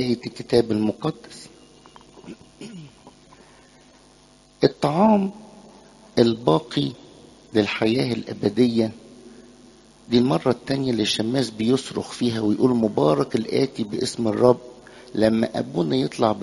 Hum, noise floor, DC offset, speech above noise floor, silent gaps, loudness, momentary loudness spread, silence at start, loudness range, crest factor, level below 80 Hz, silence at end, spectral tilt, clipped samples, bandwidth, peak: none; -53 dBFS; under 0.1%; 32 dB; none; -22 LUFS; 19 LU; 0 s; 6 LU; 22 dB; -56 dBFS; 0 s; -6 dB/octave; under 0.1%; 11.5 kHz; -2 dBFS